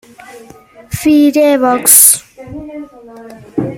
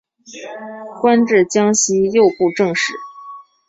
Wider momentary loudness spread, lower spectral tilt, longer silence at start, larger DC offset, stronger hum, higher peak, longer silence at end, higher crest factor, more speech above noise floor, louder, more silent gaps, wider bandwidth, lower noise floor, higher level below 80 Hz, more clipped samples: first, 25 LU vs 20 LU; about the same, -3 dB/octave vs -3.5 dB/octave; about the same, 0.3 s vs 0.3 s; neither; neither; about the same, 0 dBFS vs -2 dBFS; second, 0 s vs 0.25 s; about the same, 12 dB vs 14 dB; first, 31 dB vs 22 dB; first, -8 LUFS vs -15 LUFS; neither; first, over 20 kHz vs 8 kHz; about the same, -38 dBFS vs -37 dBFS; first, -46 dBFS vs -60 dBFS; first, 0.9% vs under 0.1%